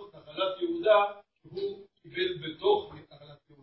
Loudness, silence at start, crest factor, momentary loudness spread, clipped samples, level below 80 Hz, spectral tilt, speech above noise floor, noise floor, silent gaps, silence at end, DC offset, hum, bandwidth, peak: -29 LUFS; 0 s; 20 dB; 23 LU; under 0.1%; -68 dBFS; -8.5 dB/octave; 27 dB; -53 dBFS; none; 0.25 s; under 0.1%; none; 5.8 kHz; -10 dBFS